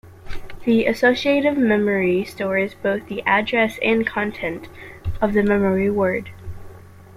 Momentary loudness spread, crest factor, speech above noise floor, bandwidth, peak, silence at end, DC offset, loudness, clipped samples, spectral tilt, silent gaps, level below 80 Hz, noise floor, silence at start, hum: 20 LU; 16 dB; 21 dB; 15 kHz; -4 dBFS; 0.05 s; under 0.1%; -20 LUFS; under 0.1%; -6.5 dB/octave; none; -42 dBFS; -41 dBFS; 0.05 s; none